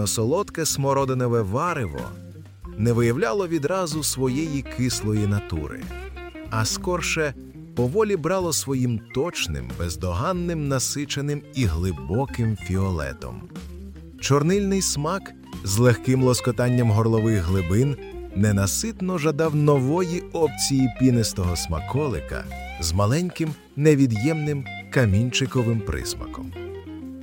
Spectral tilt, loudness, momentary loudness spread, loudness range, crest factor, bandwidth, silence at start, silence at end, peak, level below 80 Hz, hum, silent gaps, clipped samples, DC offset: -5.5 dB/octave; -23 LUFS; 15 LU; 4 LU; 20 dB; 17 kHz; 0 s; 0 s; -4 dBFS; -42 dBFS; none; none; under 0.1%; under 0.1%